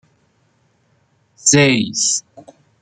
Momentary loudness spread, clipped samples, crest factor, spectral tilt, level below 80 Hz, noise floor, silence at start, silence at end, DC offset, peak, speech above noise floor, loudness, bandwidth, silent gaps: 6 LU; under 0.1%; 18 dB; -3 dB/octave; -58 dBFS; -60 dBFS; 1.45 s; 0.6 s; under 0.1%; 0 dBFS; 45 dB; -14 LUFS; 10 kHz; none